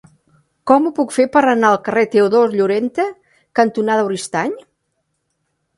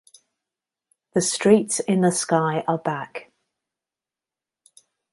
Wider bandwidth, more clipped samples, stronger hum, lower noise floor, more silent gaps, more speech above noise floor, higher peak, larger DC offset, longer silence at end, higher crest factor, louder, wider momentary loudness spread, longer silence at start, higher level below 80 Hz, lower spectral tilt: about the same, 11.5 kHz vs 11.5 kHz; neither; neither; second, -70 dBFS vs -90 dBFS; neither; second, 55 dB vs 69 dB; about the same, 0 dBFS vs -2 dBFS; neither; second, 1.2 s vs 1.9 s; second, 16 dB vs 22 dB; first, -16 LUFS vs -21 LUFS; second, 9 LU vs 12 LU; second, 0.65 s vs 1.15 s; first, -62 dBFS vs -68 dBFS; about the same, -5 dB/octave vs -4.5 dB/octave